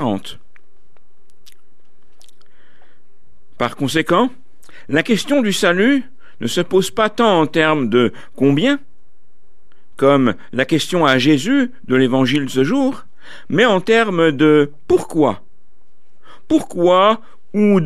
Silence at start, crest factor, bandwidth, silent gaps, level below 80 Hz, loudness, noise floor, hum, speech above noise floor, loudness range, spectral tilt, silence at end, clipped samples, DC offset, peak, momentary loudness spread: 0 s; 16 dB; 14.5 kHz; none; -54 dBFS; -16 LUFS; -61 dBFS; none; 46 dB; 7 LU; -5.5 dB/octave; 0 s; under 0.1%; 4%; -2 dBFS; 8 LU